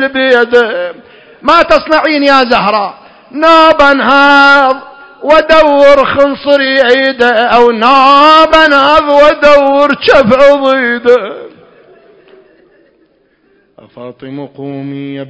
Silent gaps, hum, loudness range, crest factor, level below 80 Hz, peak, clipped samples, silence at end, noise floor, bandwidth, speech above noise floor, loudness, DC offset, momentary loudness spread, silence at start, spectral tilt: none; none; 7 LU; 8 dB; -40 dBFS; 0 dBFS; 5%; 0 s; -51 dBFS; 8 kHz; 45 dB; -6 LUFS; under 0.1%; 17 LU; 0 s; -4.5 dB/octave